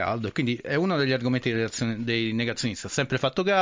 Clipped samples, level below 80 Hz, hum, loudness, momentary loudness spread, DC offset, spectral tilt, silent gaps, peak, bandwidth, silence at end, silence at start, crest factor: under 0.1%; -56 dBFS; none; -26 LUFS; 4 LU; under 0.1%; -5 dB/octave; none; -12 dBFS; 7.6 kHz; 0 s; 0 s; 14 dB